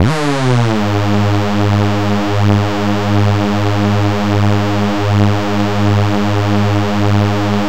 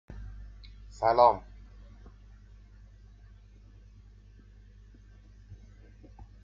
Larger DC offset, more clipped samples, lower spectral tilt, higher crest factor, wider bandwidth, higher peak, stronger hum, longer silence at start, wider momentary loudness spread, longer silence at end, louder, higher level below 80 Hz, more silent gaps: first, 7% vs under 0.1%; neither; first, -7 dB/octave vs -4 dB/octave; second, 12 dB vs 26 dB; first, 15 kHz vs 7.4 kHz; first, -2 dBFS vs -8 dBFS; second, none vs 50 Hz at -55 dBFS; about the same, 0 s vs 0.1 s; second, 2 LU vs 31 LU; second, 0 s vs 0.9 s; first, -14 LUFS vs -25 LUFS; first, -40 dBFS vs -50 dBFS; neither